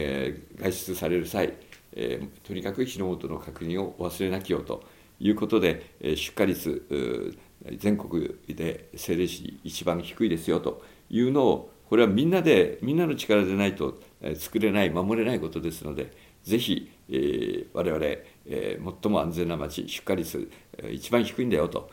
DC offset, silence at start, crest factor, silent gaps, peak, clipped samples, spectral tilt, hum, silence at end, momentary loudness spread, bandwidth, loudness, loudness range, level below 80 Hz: under 0.1%; 0 s; 20 dB; none; -6 dBFS; under 0.1%; -5.5 dB/octave; none; 0 s; 14 LU; 17 kHz; -28 LUFS; 7 LU; -54 dBFS